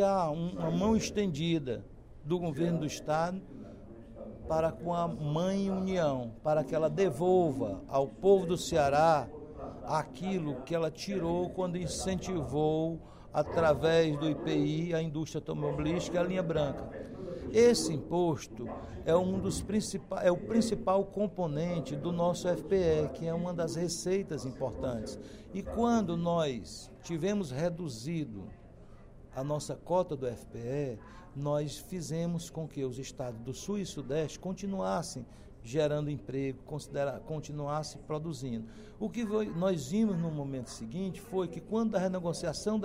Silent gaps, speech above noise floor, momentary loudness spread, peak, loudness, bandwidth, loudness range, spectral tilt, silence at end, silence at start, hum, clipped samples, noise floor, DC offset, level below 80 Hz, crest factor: none; 20 dB; 13 LU; -12 dBFS; -33 LUFS; 16 kHz; 7 LU; -6 dB/octave; 0 s; 0 s; none; under 0.1%; -52 dBFS; under 0.1%; -54 dBFS; 20 dB